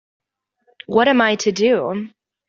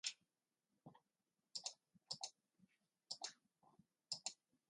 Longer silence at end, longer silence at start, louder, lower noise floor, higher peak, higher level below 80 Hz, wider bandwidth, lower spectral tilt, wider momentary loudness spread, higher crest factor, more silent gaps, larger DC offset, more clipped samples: about the same, 0.4 s vs 0.35 s; first, 0.9 s vs 0.05 s; first, -17 LUFS vs -51 LUFS; second, -65 dBFS vs under -90 dBFS; first, -2 dBFS vs -28 dBFS; first, -62 dBFS vs under -90 dBFS; second, 7.6 kHz vs 11.5 kHz; first, -4 dB/octave vs 0.5 dB/octave; second, 13 LU vs 20 LU; second, 18 dB vs 30 dB; neither; neither; neither